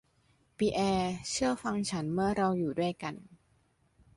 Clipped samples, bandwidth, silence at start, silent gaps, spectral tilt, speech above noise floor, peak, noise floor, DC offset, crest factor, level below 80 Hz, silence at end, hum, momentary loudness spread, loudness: under 0.1%; 11.5 kHz; 0.6 s; none; -5 dB/octave; 39 dB; -16 dBFS; -70 dBFS; under 0.1%; 16 dB; -58 dBFS; 0.8 s; none; 6 LU; -32 LUFS